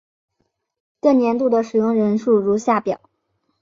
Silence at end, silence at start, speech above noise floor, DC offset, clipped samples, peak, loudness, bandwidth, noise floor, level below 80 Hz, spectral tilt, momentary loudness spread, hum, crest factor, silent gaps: 0.65 s; 1.05 s; 55 dB; under 0.1%; under 0.1%; -4 dBFS; -18 LUFS; 7.6 kHz; -72 dBFS; -64 dBFS; -7 dB/octave; 4 LU; none; 16 dB; none